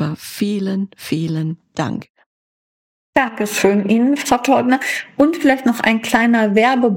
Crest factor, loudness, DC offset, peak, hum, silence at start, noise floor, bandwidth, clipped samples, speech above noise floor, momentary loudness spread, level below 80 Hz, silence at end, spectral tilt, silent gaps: 16 dB; -17 LUFS; under 0.1%; -2 dBFS; none; 0 s; under -90 dBFS; 17 kHz; under 0.1%; over 74 dB; 10 LU; -54 dBFS; 0 s; -5 dB/octave; 2.10-2.14 s, 2.26-3.13 s